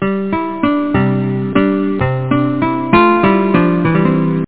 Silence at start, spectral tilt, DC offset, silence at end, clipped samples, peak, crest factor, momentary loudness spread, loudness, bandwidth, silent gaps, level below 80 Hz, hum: 0 s; -11.5 dB/octave; 1%; 0 s; under 0.1%; 0 dBFS; 14 dB; 6 LU; -14 LUFS; 4 kHz; none; -40 dBFS; none